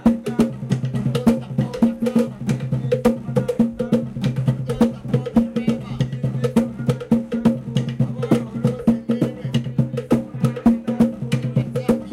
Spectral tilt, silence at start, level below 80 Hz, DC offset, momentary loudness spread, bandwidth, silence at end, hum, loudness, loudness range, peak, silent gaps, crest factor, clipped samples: -8 dB/octave; 0 s; -44 dBFS; under 0.1%; 5 LU; 13 kHz; 0 s; none; -21 LUFS; 1 LU; -4 dBFS; none; 16 dB; under 0.1%